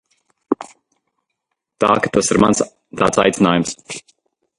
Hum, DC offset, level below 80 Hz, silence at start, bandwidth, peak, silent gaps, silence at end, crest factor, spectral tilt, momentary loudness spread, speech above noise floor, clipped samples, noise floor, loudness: none; under 0.1%; -48 dBFS; 0.5 s; 11.5 kHz; 0 dBFS; none; 0.6 s; 18 dB; -4.5 dB/octave; 16 LU; 60 dB; under 0.1%; -76 dBFS; -17 LUFS